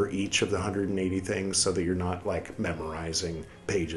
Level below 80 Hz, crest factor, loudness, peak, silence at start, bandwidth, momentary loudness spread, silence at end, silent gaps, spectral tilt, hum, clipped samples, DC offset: -54 dBFS; 18 dB; -29 LUFS; -10 dBFS; 0 s; 12 kHz; 8 LU; 0 s; none; -4 dB/octave; none; under 0.1%; under 0.1%